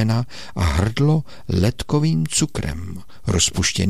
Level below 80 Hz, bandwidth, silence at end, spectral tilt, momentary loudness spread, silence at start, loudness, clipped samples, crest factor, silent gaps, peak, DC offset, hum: -34 dBFS; 15 kHz; 0 s; -4.5 dB/octave; 11 LU; 0 s; -20 LUFS; under 0.1%; 14 dB; none; -6 dBFS; 2%; none